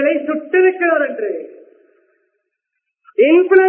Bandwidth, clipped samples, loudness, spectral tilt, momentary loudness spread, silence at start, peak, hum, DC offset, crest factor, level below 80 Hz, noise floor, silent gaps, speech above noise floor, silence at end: 3.3 kHz; under 0.1%; -15 LUFS; -8 dB/octave; 14 LU; 0 s; 0 dBFS; none; under 0.1%; 16 dB; -72 dBFS; -76 dBFS; none; 64 dB; 0 s